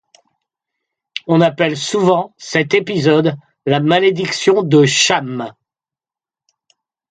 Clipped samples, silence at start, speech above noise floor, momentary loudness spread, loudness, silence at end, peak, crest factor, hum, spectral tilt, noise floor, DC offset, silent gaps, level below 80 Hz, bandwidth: under 0.1%; 1.15 s; over 76 dB; 13 LU; -14 LUFS; 1.6 s; 0 dBFS; 16 dB; none; -4.5 dB/octave; under -90 dBFS; under 0.1%; none; -60 dBFS; 9.6 kHz